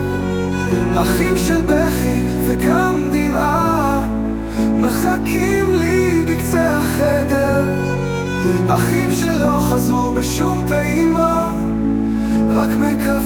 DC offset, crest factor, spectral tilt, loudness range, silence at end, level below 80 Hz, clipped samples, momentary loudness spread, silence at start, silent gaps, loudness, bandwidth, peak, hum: under 0.1%; 14 dB; -6 dB/octave; 1 LU; 0 s; -30 dBFS; under 0.1%; 4 LU; 0 s; none; -17 LUFS; 19.5 kHz; -2 dBFS; none